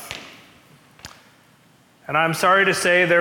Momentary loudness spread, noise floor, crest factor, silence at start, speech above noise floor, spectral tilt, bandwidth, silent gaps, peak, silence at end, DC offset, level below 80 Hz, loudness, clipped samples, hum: 19 LU; -55 dBFS; 16 dB; 0 s; 38 dB; -3.5 dB/octave; 18 kHz; none; -6 dBFS; 0 s; under 0.1%; -62 dBFS; -17 LUFS; under 0.1%; none